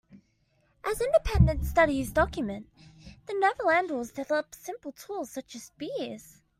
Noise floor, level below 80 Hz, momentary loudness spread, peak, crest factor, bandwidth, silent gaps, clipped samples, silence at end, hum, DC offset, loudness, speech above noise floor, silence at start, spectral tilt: -69 dBFS; -40 dBFS; 16 LU; -8 dBFS; 22 dB; 16 kHz; none; under 0.1%; 0.35 s; none; under 0.1%; -28 LUFS; 42 dB; 0.15 s; -6 dB/octave